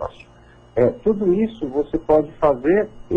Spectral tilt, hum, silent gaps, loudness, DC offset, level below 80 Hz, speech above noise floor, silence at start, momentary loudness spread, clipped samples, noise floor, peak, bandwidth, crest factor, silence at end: -9.5 dB/octave; none; none; -20 LUFS; under 0.1%; -42 dBFS; 29 dB; 0 s; 7 LU; under 0.1%; -48 dBFS; -6 dBFS; 6.8 kHz; 14 dB; 0 s